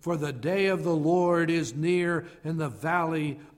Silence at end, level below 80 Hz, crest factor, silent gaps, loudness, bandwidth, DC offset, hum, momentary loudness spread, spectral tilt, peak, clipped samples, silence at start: 0.1 s; -64 dBFS; 14 dB; none; -27 LUFS; 15.5 kHz; under 0.1%; none; 8 LU; -6.5 dB/octave; -12 dBFS; under 0.1%; 0.05 s